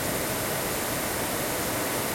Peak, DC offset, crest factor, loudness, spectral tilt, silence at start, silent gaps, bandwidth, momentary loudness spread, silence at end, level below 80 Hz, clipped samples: -16 dBFS; under 0.1%; 12 dB; -27 LUFS; -3 dB/octave; 0 s; none; 16.5 kHz; 0 LU; 0 s; -48 dBFS; under 0.1%